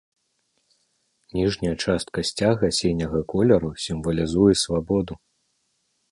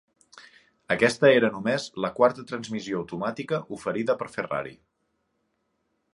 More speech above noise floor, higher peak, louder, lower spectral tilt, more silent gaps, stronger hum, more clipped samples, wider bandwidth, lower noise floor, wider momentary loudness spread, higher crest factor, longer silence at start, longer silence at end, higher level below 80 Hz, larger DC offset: about the same, 49 dB vs 50 dB; about the same, -4 dBFS vs -6 dBFS; first, -22 LUFS vs -25 LUFS; about the same, -5.5 dB/octave vs -5 dB/octave; neither; neither; neither; about the same, 11.5 kHz vs 11.5 kHz; second, -71 dBFS vs -75 dBFS; second, 9 LU vs 13 LU; about the same, 20 dB vs 22 dB; first, 1.35 s vs 0.35 s; second, 0.95 s vs 1.4 s; first, -44 dBFS vs -66 dBFS; neither